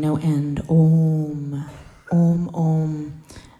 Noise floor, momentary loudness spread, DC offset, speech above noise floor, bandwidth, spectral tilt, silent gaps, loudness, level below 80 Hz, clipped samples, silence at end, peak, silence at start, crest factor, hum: -40 dBFS; 15 LU; under 0.1%; 22 dB; 7.6 kHz; -9.5 dB/octave; none; -20 LUFS; -48 dBFS; under 0.1%; 0.2 s; -8 dBFS; 0 s; 12 dB; none